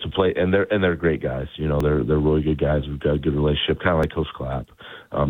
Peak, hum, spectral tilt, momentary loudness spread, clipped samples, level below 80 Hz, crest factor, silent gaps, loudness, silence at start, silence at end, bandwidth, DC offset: -4 dBFS; none; -8.5 dB/octave; 10 LU; under 0.1%; -34 dBFS; 18 dB; none; -22 LUFS; 0 s; 0 s; 6.6 kHz; under 0.1%